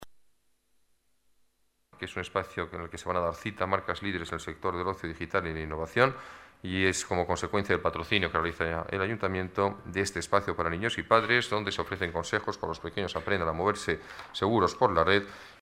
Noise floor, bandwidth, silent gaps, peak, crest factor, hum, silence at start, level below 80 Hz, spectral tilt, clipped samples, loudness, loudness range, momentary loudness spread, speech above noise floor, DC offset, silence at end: -70 dBFS; 16 kHz; none; -6 dBFS; 26 dB; none; 0 s; -52 dBFS; -4.5 dB/octave; under 0.1%; -30 LUFS; 5 LU; 11 LU; 41 dB; under 0.1%; 0.05 s